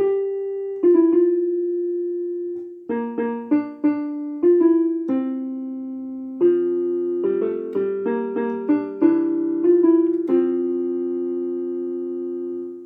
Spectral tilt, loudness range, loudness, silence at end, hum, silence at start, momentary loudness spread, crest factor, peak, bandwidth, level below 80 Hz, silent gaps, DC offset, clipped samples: -10.5 dB/octave; 3 LU; -21 LUFS; 0 s; none; 0 s; 12 LU; 14 dB; -6 dBFS; 3 kHz; -76 dBFS; none; under 0.1%; under 0.1%